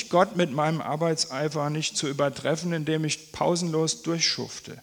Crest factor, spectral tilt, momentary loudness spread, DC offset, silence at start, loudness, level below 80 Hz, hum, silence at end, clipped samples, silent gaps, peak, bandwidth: 20 dB; -4 dB/octave; 4 LU; under 0.1%; 0 s; -26 LUFS; -64 dBFS; none; 0 s; under 0.1%; none; -6 dBFS; 19 kHz